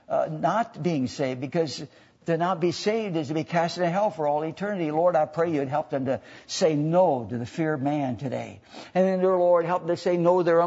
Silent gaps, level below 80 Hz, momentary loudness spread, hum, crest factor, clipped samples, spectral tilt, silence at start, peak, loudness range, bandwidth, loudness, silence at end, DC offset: none; -68 dBFS; 10 LU; none; 16 dB; under 0.1%; -6.5 dB/octave; 0.1 s; -8 dBFS; 2 LU; 8 kHz; -25 LUFS; 0 s; under 0.1%